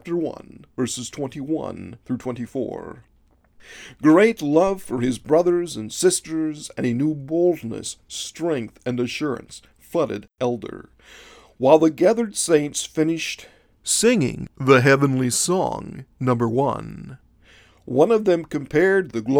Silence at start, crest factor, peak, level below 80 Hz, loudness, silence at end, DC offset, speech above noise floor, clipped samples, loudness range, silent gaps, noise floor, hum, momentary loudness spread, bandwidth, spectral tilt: 0.05 s; 22 dB; 0 dBFS; -54 dBFS; -21 LUFS; 0 s; under 0.1%; 34 dB; under 0.1%; 7 LU; none; -55 dBFS; none; 16 LU; 18.5 kHz; -5 dB/octave